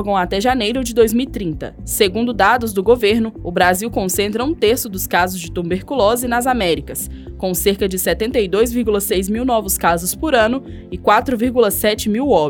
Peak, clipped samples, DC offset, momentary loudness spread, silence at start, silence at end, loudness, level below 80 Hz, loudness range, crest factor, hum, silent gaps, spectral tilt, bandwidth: 0 dBFS; under 0.1%; under 0.1%; 8 LU; 0 s; 0 s; -17 LUFS; -36 dBFS; 2 LU; 16 dB; none; none; -4 dB/octave; 20 kHz